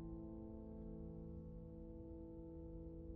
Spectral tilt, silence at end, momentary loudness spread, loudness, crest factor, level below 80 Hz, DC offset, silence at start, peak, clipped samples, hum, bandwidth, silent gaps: -12.5 dB/octave; 0 s; 2 LU; -54 LUFS; 12 dB; -58 dBFS; under 0.1%; 0 s; -42 dBFS; under 0.1%; none; 2.6 kHz; none